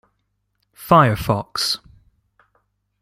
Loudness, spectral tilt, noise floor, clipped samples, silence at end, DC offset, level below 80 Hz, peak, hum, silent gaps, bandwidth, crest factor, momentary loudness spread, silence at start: -18 LUFS; -5 dB/octave; -71 dBFS; under 0.1%; 1.25 s; under 0.1%; -46 dBFS; -2 dBFS; 50 Hz at -45 dBFS; none; 16 kHz; 20 dB; 12 LU; 0.8 s